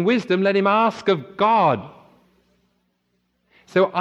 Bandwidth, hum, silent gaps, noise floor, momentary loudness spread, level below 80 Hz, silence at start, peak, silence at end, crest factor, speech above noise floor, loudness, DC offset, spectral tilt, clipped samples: 8.2 kHz; none; none; -70 dBFS; 6 LU; -68 dBFS; 0 s; -6 dBFS; 0 s; 16 dB; 51 dB; -19 LUFS; under 0.1%; -7 dB/octave; under 0.1%